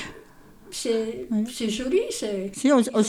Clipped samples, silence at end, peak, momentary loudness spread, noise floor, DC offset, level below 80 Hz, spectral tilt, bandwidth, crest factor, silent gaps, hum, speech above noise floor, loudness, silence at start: under 0.1%; 0 s; -8 dBFS; 10 LU; -49 dBFS; under 0.1%; -56 dBFS; -4.5 dB/octave; 16 kHz; 18 dB; none; none; 25 dB; -25 LUFS; 0 s